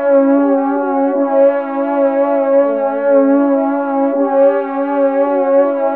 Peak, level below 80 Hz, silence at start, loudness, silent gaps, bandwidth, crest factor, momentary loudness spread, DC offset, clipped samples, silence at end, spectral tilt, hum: -2 dBFS; -74 dBFS; 0 s; -13 LUFS; none; 3.5 kHz; 12 dB; 4 LU; 0.3%; under 0.1%; 0 s; -9.5 dB/octave; none